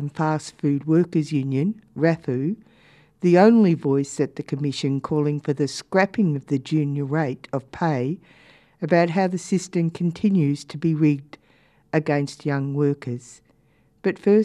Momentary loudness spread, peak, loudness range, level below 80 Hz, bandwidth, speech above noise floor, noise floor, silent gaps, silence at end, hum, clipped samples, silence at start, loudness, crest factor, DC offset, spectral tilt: 8 LU; -4 dBFS; 4 LU; -64 dBFS; 11 kHz; 39 dB; -61 dBFS; none; 0 s; none; under 0.1%; 0 s; -22 LUFS; 18 dB; under 0.1%; -7 dB/octave